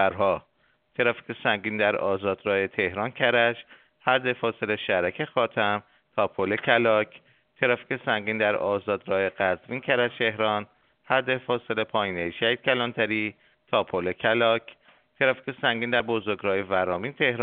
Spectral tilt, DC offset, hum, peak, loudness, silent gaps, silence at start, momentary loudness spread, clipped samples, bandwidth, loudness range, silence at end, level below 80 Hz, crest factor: -2 dB/octave; under 0.1%; none; -4 dBFS; -25 LUFS; none; 0 s; 6 LU; under 0.1%; 4.6 kHz; 1 LU; 0 s; -66 dBFS; 22 dB